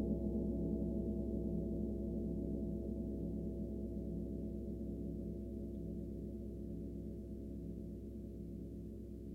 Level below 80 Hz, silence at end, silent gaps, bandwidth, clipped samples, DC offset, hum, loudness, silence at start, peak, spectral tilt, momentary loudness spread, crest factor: -48 dBFS; 0 s; none; 1.5 kHz; under 0.1%; under 0.1%; none; -44 LUFS; 0 s; -26 dBFS; -11.5 dB/octave; 9 LU; 16 dB